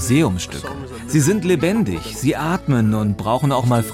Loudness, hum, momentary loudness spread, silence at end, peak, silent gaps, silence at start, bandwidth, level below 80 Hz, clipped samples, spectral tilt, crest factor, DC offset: -19 LUFS; none; 9 LU; 0 s; -4 dBFS; none; 0 s; 16.5 kHz; -42 dBFS; under 0.1%; -6 dB/octave; 14 dB; under 0.1%